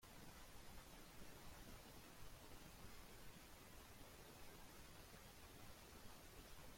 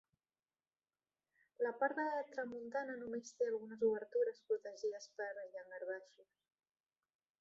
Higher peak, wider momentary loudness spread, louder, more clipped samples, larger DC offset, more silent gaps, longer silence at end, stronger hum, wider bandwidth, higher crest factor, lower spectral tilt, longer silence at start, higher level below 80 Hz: second, -44 dBFS vs -22 dBFS; second, 1 LU vs 9 LU; second, -62 LUFS vs -42 LUFS; neither; neither; neither; second, 0 s vs 1.2 s; neither; first, 16.5 kHz vs 7.6 kHz; second, 14 dB vs 20 dB; about the same, -3.5 dB/octave vs -3 dB/octave; second, 0 s vs 1.6 s; first, -66 dBFS vs -88 dBFS